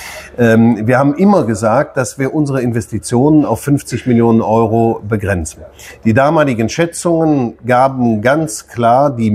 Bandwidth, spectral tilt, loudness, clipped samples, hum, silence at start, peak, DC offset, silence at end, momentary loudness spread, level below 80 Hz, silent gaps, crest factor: 15 kHz; -6.5 dB/octave; -13 LUFS; under 0.1%; none; 0 s; 0 dBFS; under 0.1%; 0 s; 7 LU; -44 dBFS; none; 12 dB